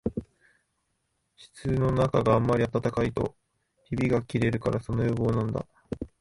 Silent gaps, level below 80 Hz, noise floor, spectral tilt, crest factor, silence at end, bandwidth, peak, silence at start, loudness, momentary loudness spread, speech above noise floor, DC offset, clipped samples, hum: none; -46 dBFS; -76 dBFS; -8 dB/octave; 18 dB; 0.15 s; 11.5 kHz; -10 dBFS; 0.05 s; -27 LUFS; 13 LU; 50 dB; under 0.1%; under 0.1%; none